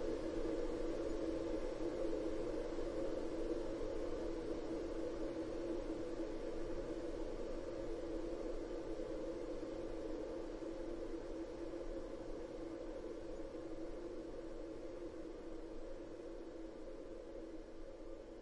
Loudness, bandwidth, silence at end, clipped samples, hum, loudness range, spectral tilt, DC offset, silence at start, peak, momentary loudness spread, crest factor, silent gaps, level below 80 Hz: -46 LUFS; 11 kHz; 0 s; under 0.1%; none; 7 LU; -6.5 dB/octave; under 0.1%; 0 s; -30 dBFS; 9 LU; 14 dB; none; -52 dBFS